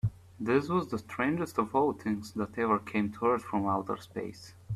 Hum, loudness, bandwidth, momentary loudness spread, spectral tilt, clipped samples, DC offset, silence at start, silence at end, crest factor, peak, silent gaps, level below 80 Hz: none; -31 LUFS; 14.5 kHz; 10 LU; -7 dB/octave; under 0.1%; under 0.1%; 0.05 s; 0 s; 16 dB; -14 dBFS; none; -60 dBFS